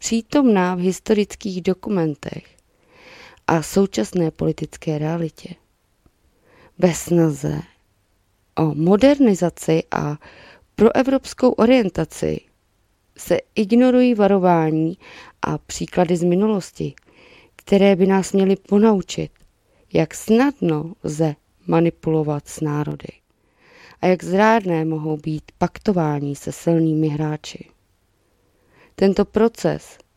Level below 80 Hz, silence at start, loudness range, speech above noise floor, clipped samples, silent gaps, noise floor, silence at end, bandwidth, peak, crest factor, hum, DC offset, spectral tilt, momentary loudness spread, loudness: -50 dBFS; 0 s; 5 LU; 45 dB; under 0.1%; none; -64 dBFS; 0.4 s; 15.5 kHz; -2 dBFS; 18 dB; none; under 0.1%; -6.5 dB/octave; 13 LU; -19 LUFS